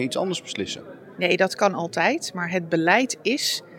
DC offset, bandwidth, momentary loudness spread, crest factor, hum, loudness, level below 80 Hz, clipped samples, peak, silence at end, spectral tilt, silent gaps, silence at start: under 0.1%; 17 kHz; 10 LU; 20 dB; none; -23 LUFS; -74 dBFS; under 0.1%; -4 dBFS; 0 s; -3.5 dB/octave; none; 0 s